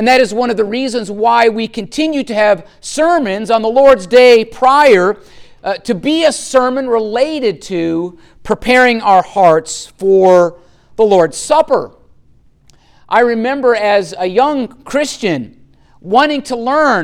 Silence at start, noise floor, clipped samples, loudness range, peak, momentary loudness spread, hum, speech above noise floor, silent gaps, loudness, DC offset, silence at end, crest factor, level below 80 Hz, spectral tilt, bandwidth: 0 s; -47 dBFS; under 0.1%; 5 LU; 0 dBFS; 12 LU; none; 35 dB; none; -12 LUFS; under 0.1%; 0 s; 12 dB; -46 dBFS; -4 dB/octave; 14 kHz